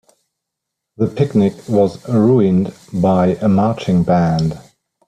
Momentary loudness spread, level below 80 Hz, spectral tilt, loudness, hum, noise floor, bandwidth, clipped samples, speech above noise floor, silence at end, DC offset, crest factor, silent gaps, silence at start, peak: 8 LU; -48 dBFS; -8.5 dB/octave; -16 LUFS; none; -79 dBFS; 10 kHz; under 0.1%; 65 dB; 0.45 s; under 0.1%; 14 dB; none; 1 s; -2 dBFS